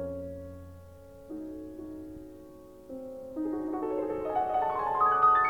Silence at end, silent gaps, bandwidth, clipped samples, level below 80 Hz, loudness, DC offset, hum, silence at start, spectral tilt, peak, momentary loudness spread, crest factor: 0 s; none; 18 kHz; under 0.1%; -58 dBFS; -30 LUFS; under 0.1%; none; 0 s; -7.5 dB/octave; -12 dBFS; 24 LU; 18 dB